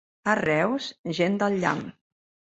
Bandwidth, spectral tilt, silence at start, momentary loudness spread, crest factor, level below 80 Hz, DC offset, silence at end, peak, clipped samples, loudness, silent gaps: 8.2 kHz; -5.5 dB/octave; 0.25 s; 9 LU; 20 dB; -64 dBFS; under 0.1%; 0.65 s; -8 dBFS; under 0.1%; -25 LUFS; 0.99-1.04 s